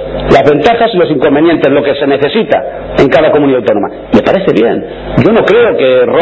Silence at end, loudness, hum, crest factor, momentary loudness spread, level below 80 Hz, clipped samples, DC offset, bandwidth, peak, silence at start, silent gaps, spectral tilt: 0 s; -8 LUFS; none; 8 dB; 6 LU; -32 dBFS; 2%; under 0.1%; 8 kHz; 0 dBFS; 0 s; none; -7.5 dB/octave